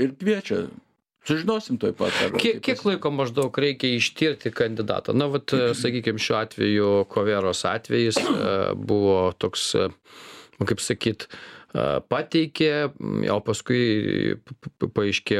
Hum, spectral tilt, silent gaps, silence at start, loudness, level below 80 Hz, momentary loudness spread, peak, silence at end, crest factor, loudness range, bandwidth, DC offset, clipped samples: none; -5 dB/octave; none; 0 s; -24 LUFS; -58 dBFS; 7 LU; -6 dBFS; 0 s; 18 dB; 3 LU; 14.5 kHz; under 0.1%; under 0.1%